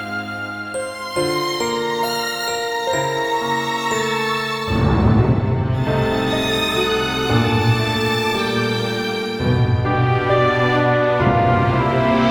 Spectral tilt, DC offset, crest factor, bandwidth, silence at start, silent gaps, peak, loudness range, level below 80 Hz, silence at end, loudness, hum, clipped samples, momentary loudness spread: -5.5 dB/octave; under 0.1%; 16 dB; 19.5 kHz; 0 s; none; -2 dBFS; 3 LU; -36 dBFS; 0 s; -18 LUFS; none; under 0.1%; 6 LU